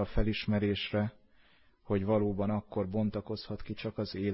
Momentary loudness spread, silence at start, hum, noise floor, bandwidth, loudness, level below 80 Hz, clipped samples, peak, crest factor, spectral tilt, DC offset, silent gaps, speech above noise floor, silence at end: 9 LU; 0 s; none; -63 dBFS; 5.8 kHz; -33 LUFS; -46 dBFS; under 0.1%; -16 dBFS; 18 dB; -10.5 dB/octave; under 0.1%; none; 31 dB; 0 s